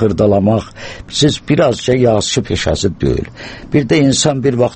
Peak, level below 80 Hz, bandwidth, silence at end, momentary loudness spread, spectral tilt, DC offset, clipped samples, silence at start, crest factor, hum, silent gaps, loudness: 0 dBFS; -34 dBFS; 8.8 kHz; 0 s; 9 LU; -5 dB/octave; under 0.1%; under 0.1%; 0 s; 14 dB; none; none; -14 LUFS